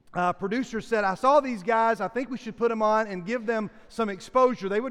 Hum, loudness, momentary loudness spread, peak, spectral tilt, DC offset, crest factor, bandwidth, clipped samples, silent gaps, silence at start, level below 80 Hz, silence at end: none; -26 LUFS; 9 LU; -8 dBFS; -5.5 dB/octave; under 0.1%; 16 dB; 12 kHz; under 0.1%; none; 0.1 s; -58 dBFS; 0 s